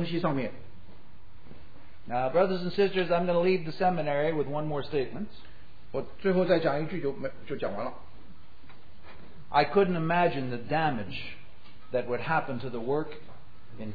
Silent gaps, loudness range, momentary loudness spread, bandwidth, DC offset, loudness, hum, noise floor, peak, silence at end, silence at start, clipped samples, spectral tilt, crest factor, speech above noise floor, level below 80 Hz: none; 4 LU; 13 LU; 5 kHz; 2%; -29 LUFS; none; -55 dBFS; -10 dBFS; 0 s; 0 s; under 0.1%; -9 dB/octave; 18 dB; 26 dB; -58 dBFS